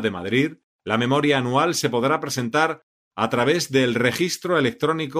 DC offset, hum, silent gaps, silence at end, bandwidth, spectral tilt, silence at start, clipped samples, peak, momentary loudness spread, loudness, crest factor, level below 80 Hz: under 0.1%; none; 0.64-0.79 s, 2.83-3.11 s; 0 s; 15.5 kHz; -4.5 dB/octave; 0 s; under 0.1%; -4 dBFS; 7 LU; -21 LUFS; 18 dB; -62 dBFS